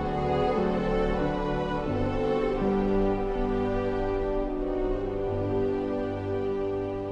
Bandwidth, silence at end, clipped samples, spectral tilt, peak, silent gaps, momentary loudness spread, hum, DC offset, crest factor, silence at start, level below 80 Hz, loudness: 7.8 kHz; 0 s; under 0.1%; -8.5 dB/octave; -14 dBFS; none; 4 LU; none; under 0.1%; 14 dB; 0 s; -36 dBFS; -28 LUFS